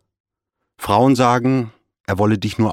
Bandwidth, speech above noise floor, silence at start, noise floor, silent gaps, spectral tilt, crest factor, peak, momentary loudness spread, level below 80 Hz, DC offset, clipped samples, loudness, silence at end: 16 kHz; 63 dB; 0.8 s; -78 dBFS; none; -6.5 dB/octave; 18 dB; 0 dBFS; 17 LU; -50 dBFS; under 0.1%; under 0.1%; -17 LUFS; 0 s